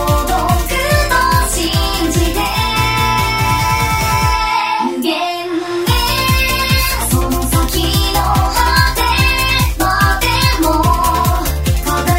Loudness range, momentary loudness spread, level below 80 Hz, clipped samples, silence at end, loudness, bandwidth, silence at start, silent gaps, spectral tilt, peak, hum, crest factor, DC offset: 2 LU; 4 LU; -20 dBFS; under 0.1%; 0 s; -14 LUFS; 16.5 kHz; 0 s; none; -4 dB/octave; 0 dBFS; none; 14 dB; 0.2%